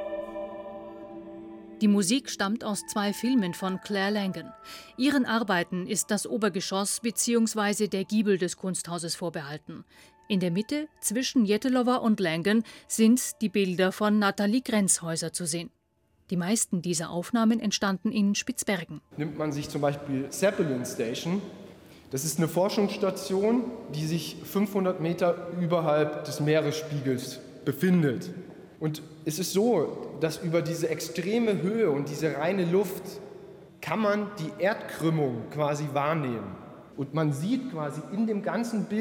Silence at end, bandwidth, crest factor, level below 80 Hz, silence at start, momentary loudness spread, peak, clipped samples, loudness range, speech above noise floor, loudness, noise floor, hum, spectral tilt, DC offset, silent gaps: 0 s; 17.5 kHz; 18 dB; -68 dBFS; 0 s; 13 LU; -10 dBFS; under 0.1%; 4 LU; 41 dB; -28 LUFS; -69 dBFS; none; -4.5 dB/octave; under 0.1%; none